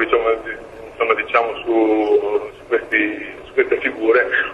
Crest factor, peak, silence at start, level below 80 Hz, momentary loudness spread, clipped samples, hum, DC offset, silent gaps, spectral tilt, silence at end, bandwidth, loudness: 18 dB; -2 dBFS; 0 s; -50 dBFS; 8 LU; under 0.1%; none; under 0.1%; none; -5.5 dB/octave; 0 s; 6.8 kHz; -18 LUFS